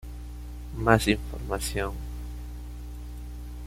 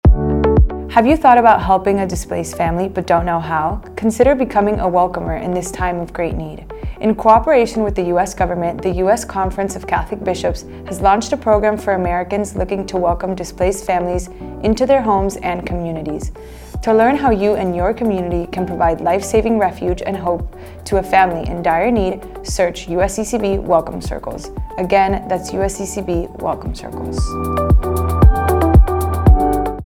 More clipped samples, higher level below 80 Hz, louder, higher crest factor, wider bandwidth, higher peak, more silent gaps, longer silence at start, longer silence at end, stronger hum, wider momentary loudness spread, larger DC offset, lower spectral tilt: neither; second, -36 dBFS vs -24 dBFS; second, -28 LUFS vs -16 LUFS; first, 26 dB vs 16 dB; about the same, 16 kHz vs 16.5 kHz; second, -4 dBFS vs 0 dBFS; neither; about the same, 0 s vs 0.05 s; about the same, 0 s vs 0.05 s; first, 60 Hz at -35 dBFS vs none; first, 19 LU vs 11 LU; neither; second, -5 dB/octave vs -6.5 dB/octave